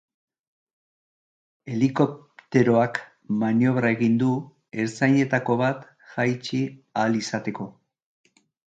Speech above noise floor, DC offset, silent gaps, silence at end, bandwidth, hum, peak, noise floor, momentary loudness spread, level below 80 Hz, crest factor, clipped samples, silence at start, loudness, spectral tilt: over 67 dB; under 0.1%; none; 0.95 s; 8.8 kHz; none; -6 dBFS; under -90 dBFS; 12 LU; -66 dBFS; 18 dB; under 0.1%; 1.65 s; -24 LUFS; -7 dB/octave